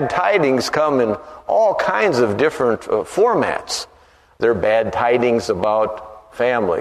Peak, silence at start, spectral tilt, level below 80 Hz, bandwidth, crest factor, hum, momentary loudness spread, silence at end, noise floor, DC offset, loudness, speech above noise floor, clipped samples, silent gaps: -2 dBFS; 0 s; -5 dB/octave; -52 dBFS; 13.5 kHz; 16 dB; none; 8 LU; 0 s; -48 dBFS; under 0.1%; -18 LUFS; 31 dB; under 0.1%; none